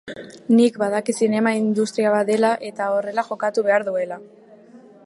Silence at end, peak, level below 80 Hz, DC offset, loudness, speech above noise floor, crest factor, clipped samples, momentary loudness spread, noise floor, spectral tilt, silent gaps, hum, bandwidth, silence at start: 0.3 s; -4 dBFS; -72 dBFS; under 0.1%; -20 LUFS; 26 dB; 16 dB; under 0.1%; 9 LU; -46 dBFS; -5.5 dB/octave; none; none; 11.5 kHz; 0.05 s